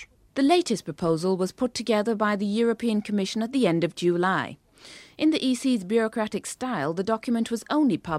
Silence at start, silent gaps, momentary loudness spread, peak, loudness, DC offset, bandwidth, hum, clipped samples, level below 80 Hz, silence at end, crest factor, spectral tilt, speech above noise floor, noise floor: 0 s; none; 6 LU; -8 dBFS; -25 LUFS; under 0.1%; 14.5 kHz; none; under 0.1%; -62 dBFS; 0 s; 16 dB; -5.5 dB/octave; 24 dB; -48 dBFS